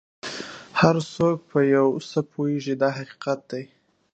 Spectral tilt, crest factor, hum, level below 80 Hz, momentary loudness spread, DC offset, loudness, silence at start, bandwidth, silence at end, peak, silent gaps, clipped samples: -6.5 dB/octave; 22 dB; none; -62 dBFS; 14 LU; under 0.1%; -23 LUFS; 0.25 s; 8.6 kHz; 0.5 s; -2 dBFS; none; under 0.1%